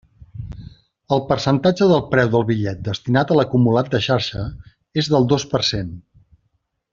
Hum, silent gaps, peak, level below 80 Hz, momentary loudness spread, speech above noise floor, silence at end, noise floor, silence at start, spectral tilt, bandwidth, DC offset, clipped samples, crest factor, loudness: none; none; -2 dBFS; -46 dBFS; 16 LU; 51 dB; 0.9 s; -69 dBFS; 0.35 s; -6 dB/octave; 7.6 kHz; under 0.1%; under 0.1%; 18 dB; -18 LUFS